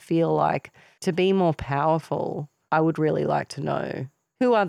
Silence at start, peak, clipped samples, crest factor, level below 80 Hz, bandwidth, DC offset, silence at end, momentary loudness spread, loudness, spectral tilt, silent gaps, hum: 0.1 s; -8 dBFS; under 0.1%; 16 dB; -54 dBFS; 13 kHz; under 0.1%; 0 s; 10 LU; -24 LUFS; -7 dB/octave; none; none